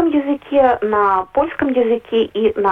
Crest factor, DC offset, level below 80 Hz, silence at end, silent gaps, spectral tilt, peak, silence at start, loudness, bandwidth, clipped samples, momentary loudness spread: 12 dB; under 0.1%; -48 dBFS; 0 s; none; -7.5 dB/octave; -4 dBFS; 0 s; -16 LUFS; 4.1 kHz; under 0.1%; 4 LU